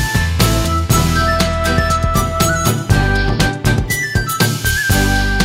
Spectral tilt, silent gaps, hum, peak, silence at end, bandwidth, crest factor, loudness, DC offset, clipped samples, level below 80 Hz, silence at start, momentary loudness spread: -4.5 dB/octave; none; none; 0 dBFS; 0 s; 16.5 kHz; 14 dB; -15 LUFS; under 0.1%; under 0.1%; -22 dBFS; 0 s; 3 LU